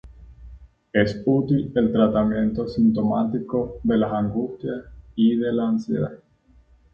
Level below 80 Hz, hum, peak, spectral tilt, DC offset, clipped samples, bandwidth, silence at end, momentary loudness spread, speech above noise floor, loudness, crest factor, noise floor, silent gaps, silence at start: -46 dBFS; none; -4 dBFS; -9 dB/octave; under 0.1%; under 0.1%; 6.6 kHz; 0.75 s; 9 LU; 34 dB; -22 LUFS; 18 dB; -56 dBFS; none; 0.05 s